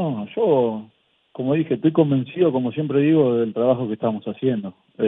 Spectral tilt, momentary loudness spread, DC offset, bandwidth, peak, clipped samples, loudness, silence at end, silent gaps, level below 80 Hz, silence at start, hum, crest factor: -11 dB/octave; 9 LU; under 0.1%; 3.9 kHz; -4 dBFS; under 0.1%; -21 LUFS; 0 s; none; -66 dBFS; 0 s; none; 16 dB